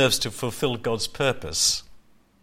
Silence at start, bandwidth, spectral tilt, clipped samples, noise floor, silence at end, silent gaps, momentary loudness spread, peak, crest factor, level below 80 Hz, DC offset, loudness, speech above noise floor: 0 s; 16.5 kHz; -2.5 dB/octave; under 0.1%; -51 dBFS; 0.45 s; none; 6 LU; -8 dBFS; 18 dB; -48 dBFS; under 0.1%; -24 LUFS; 27 dB